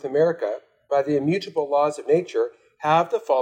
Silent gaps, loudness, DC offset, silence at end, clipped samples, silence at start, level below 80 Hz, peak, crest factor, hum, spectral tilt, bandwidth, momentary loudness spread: none; -23 LUFS; under 0.1%; 0 s; under 0.1%; 0.05 s; -72 dBFS; -6 dBFS; 16 dB; none; -6.5 dB/octave; 9.8 kHz; 8 LU